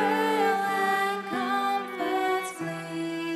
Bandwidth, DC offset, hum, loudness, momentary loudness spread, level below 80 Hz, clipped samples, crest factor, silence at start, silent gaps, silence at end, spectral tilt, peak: 15 kHz; under 0.1%; none; -27 LUFS; 9 LU; -78 dBFS; under 0.1%; 14 dB; 0 s; none; 0 s; -4 dB/octave; -12 dBFS